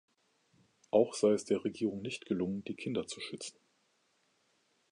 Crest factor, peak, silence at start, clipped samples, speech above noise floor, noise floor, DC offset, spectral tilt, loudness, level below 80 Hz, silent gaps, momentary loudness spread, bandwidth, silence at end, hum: 22 dB; -14 dBFS; 0.95 s; under 0.1%; 42 dB; -75 dBFS; under 0.1%; -5 dB/octave; -34 LUFS; -72 dBFS; none; 12 LU; 11 kHz; 1.4 s; none